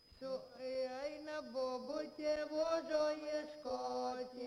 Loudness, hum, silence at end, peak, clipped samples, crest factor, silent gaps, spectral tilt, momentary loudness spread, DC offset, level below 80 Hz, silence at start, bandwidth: -41 LUFS; none; 0 s; -26 dBFS; under 0.1%; 16 dB; none; -3.5 dB/octave; 8 LU; under 0.1%; -72 dBFS; 0.1 s; 11.5 kHz